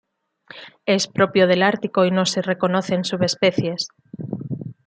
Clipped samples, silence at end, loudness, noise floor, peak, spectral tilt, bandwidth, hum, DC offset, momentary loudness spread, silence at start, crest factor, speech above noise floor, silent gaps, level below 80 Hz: under 0.1%; 0.15 s; -20 LUFS; -48 dBFS; -2 dBFS; -5 dB/octave; 9.4 kHz; none; under 0.1%; 15 LU; 0.55 s; 18 dB; 29 dB; none; -64 dBFS